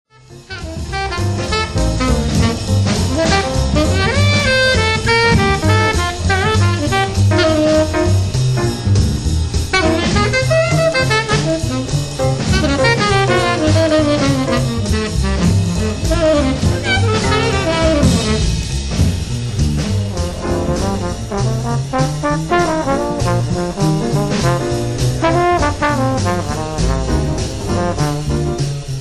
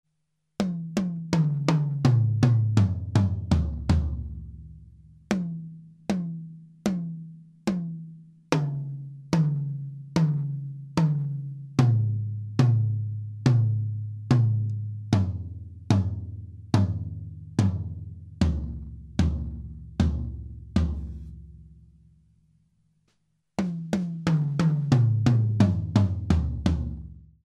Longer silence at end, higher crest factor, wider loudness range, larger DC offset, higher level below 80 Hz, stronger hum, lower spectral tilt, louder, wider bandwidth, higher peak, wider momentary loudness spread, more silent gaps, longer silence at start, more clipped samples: second, 0 s vs 0.2 s; second, 14 dB vs 22 dB; second, 4 LU vs 9 LU; neither; first, -24 dBFS vs -38 dBFS; neither; second, -5 dB/octave vs -8 dB/octave; first, -15 LUFS vs -26 LUFS; first, 12.5 kHz vs 10 kHz; about the same, -2 dBFS vs -4 dBFS; second, 6 LU vs 17 LU; neither; second, 0.3 s vs 0.6 s; neither